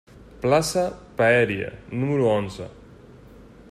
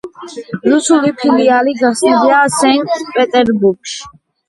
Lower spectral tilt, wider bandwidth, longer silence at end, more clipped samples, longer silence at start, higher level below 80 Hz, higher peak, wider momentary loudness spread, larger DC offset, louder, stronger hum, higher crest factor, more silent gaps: first, -5.5 dB/octave vs -4 dB/octave; first, 15 kHz vs 11.5 kHz; about the same, 0.45 s vs 0.4 s; neither; about the same, 0.15 s vs 0.05 s; about the same, -50 dBFS vs -54 dBFS; second, -6 dBFS vs 0 dBFS; about the same, 14 LU vs 15 LU; neither; second, -23 LUFS vs -12 LUFS; neither; first, 20 dB vs 12 dB; neither